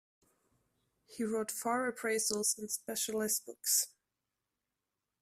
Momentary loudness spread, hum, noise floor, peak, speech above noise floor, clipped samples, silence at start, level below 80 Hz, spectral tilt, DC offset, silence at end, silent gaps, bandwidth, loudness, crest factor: 7 LU; none; -89 dBFS; -16 dBFS; 53 dB; under 0.1%; 1.1 s; -80 dBFS; -1.5 dB/octave; under 0.1%; 1.35 s; none; 16 kHz; -34 LUFS; 22 dB